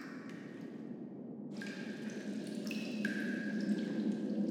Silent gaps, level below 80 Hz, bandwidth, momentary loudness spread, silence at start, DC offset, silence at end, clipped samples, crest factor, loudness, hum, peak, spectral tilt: none; under -90 dBFS; 15 kHz; 11 LU; 0 s; under 0.1%; 0 s; under 0.1%; 16 dB; -40 LUFS; none; -24 dBFS; -6 dB/octave